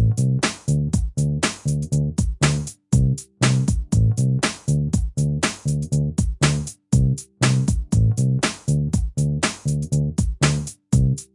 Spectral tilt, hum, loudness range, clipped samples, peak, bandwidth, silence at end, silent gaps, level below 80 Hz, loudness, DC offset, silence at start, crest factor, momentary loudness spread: -5.5 dB/octave; none; 1 LU; under 0.1%; -4 dBFS; 11.5 kHz; 0.1 s; none; -30 dBFS; -21 LUFS; under 0.1%; 0 s; 18 dB; 4 LU